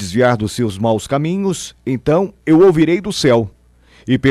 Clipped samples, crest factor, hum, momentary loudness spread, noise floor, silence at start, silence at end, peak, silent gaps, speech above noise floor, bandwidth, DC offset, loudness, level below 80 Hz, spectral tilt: under 0.1%; 12 dB; none; 11 LU; -48 dBFS; 0 s; 0 s; -4 dBFS; none; 34 dB; 14 kHz; under 0.1%; -15 LUFS; -42 dBFS; -6 dB/octave